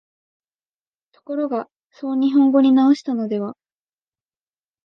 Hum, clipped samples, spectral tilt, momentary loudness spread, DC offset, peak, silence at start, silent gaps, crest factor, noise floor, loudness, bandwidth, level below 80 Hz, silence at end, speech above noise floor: none; under 0.1%; -7 dB/octave; 16 LU; under 0.1%; -6 dBFS; 1.3 s; 1.77-1.88 s; 16 dB; under -90 dBFS; -18 LUFS; 6.8 kHz; -76 dBFS; 1.35 s; over 72 dB